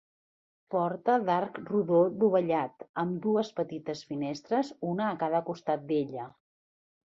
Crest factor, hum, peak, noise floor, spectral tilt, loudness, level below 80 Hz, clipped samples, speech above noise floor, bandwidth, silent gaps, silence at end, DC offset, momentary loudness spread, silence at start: 16 dB; none; -14 dBFS; under -90 dBFS; -7.5 dB/octave; -30 LUFS; -76 dBFS; under 0.1%; over 61 dB; 7.8 kHz; 2.89-2.94 s; 0.85 s; under 0.1%; 10 LU; 0.7 s